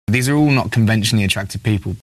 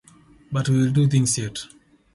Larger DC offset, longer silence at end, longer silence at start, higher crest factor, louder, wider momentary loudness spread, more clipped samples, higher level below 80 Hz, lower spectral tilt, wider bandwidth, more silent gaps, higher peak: neither; second, 0.15 s vs 0.5 s; second, 0.1 s vs 0.5 s; about the same, 14 dB vs 16 dB; first, -17 LUFS vs -21 LUFS; second, 6 LU vs 15 LU; neither; first, -42 dBFS vs -54 dBFS; about the same, -5.5 dB/octave vs -5.5 dB/octave; first, 13.5 kHz vs 12 kHz; neither; about the same, -4 dBFS vs -6 dBFS